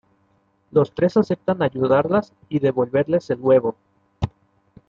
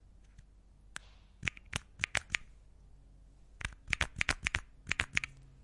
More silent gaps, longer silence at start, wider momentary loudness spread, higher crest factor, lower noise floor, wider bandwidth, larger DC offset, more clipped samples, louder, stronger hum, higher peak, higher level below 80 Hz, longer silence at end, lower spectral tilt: neither; first, 0.75 s vs 0.4 s; second, 11 LU vs 14 LU; second, 16 dB vs 32 dB; about the same, -63 dBFS vs -60 dBFS; second, 7.2 kHz vs 11.5 kHz; neither; neither; first, -21 LUFS vs -36 LUFS; neither; first, -6 dBFS vs -10 dBFS; about the same, -50 dBFS vs -52 dBFS; first, 0.6 s vs 0 s; first, -8.5 dB/octave vs -2 dB/octave